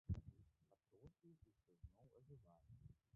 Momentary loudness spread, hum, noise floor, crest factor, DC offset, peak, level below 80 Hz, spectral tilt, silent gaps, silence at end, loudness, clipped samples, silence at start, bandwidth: 17 LU; none; -79 dBFS; 24 dB; under 0.1%; -34 dBFS; -64 dBFS; -12 dB/octave; none; 0.2 s; -61 LUFS; under 0.1%; 0.1 s; 2 kHz